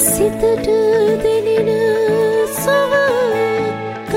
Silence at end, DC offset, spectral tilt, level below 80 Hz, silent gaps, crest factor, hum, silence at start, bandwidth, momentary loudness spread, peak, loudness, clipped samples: 0 s; under 0.1%; -4 dB/octave; -42 dBFS; none; 14 dB; none; 0 s; 16.5 kHz; 4 LU; -2 dBFS; -15 LUFS; under 0.1%